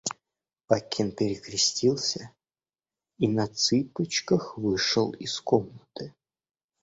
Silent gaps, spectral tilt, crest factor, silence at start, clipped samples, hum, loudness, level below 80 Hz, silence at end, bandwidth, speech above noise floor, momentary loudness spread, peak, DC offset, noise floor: none; -4 dB/octave; 22 dB; 0.05 s; under 0.1%; none; -27 LUFS; -62 dBFS; 0.7 s; 8 kHz; over 63 dB; 16 LU; -6 dBFS; under 0.1%; under -90 dBFS